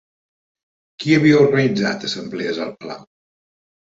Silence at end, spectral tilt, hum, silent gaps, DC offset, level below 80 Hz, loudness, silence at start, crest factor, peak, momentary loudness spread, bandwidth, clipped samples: 0.9 s; -6 dB/octave; none; none; under 0.1%; -60 dBFS; -17 LUFS; 1 s; 18 dB; -2 dBFS; 19 LU; 7.8 kHz; under 0.1%